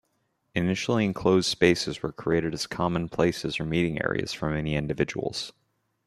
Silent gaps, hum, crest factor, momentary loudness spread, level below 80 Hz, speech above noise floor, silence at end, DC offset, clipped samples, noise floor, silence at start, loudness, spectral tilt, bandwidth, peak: none; none; 22 dB; 9 LU; -52 dBFS; 48 dB; 0.55 s; under 0.1%; under 0.1%; -74 dBFS; 0.55 s; -27 LUFS; -5.5 dB/octave; 13 kHz; -4 dBFS